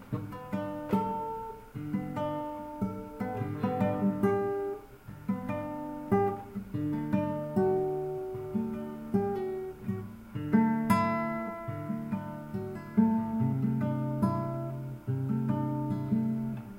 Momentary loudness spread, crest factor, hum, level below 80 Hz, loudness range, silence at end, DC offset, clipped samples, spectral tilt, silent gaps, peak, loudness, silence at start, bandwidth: 11 LU; 20 dB; none; -58 dBFS; 3 LU; 0 s; under 0.1%; under 0.1%; -9 dB/octave; none; -12 dBFS; -32 LUFS; 0 s; 16 kHz